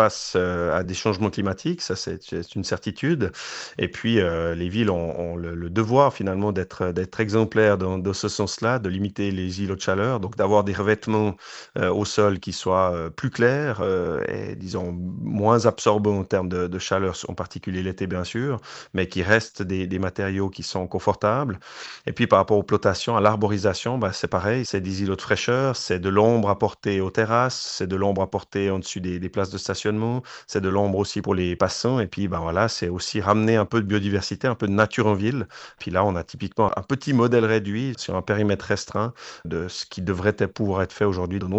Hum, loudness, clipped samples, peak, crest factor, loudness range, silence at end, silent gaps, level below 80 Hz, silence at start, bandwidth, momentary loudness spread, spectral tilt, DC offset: none; -24 LUFS; under 0.1%; -2 dBFS; 20 dB; 3 LU; 0 s; none; -54 dBFS; 0 s; 8.4 kHz; 10 LU; -5.5 dB/octave; under 0.1%